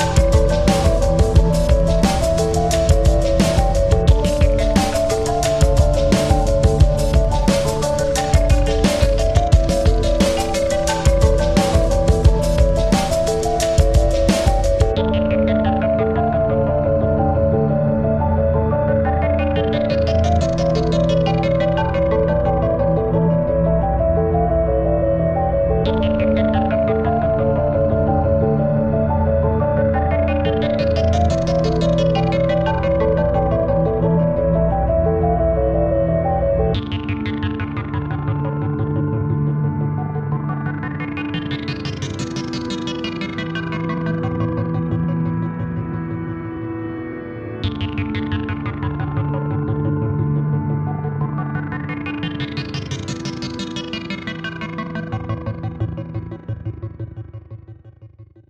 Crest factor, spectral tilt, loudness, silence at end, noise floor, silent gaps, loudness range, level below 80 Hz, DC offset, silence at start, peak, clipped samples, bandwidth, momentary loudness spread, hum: 16 dB; -6.5 dB/octave; -18 LUFS; 0.25 s; -43 dBFS; none; 8 LU; -24 dBFS; under 0.1%; 0 s; -2 dBFS; under 0.1%; 14 kHz; 10 LU; none